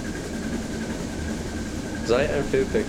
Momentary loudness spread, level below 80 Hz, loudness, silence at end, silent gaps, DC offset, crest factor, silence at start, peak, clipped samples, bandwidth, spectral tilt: 8 LU; -38 dBFS; -27 LUFS; 0 s; none; under 0.1%; 18 dB; 0 s; -8 dBFS; under 0.1%; 17 kHz; -5.5 dB/octave